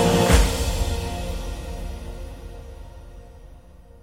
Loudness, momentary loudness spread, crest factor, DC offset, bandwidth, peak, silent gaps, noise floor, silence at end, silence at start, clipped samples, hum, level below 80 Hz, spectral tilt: -24 LUFS; 25 LU; 22 dB; under 0.1%; 16.5 kHz; -2 dBFS; none; -46 dBFS; 0.05 s; 0 s; under 0.1%; none; -28 dBFS; -5 dB/octave